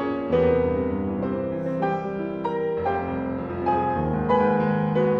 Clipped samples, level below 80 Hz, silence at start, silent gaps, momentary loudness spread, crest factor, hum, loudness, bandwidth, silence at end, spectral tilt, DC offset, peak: under 0.1%; -44 dBFS; 0 s; none; 7 LU; 14 dB; none; -24 LUFS; 5.6 kHz; 0 s; -9.5 dB/octave; under 0.1%; -10 dBFS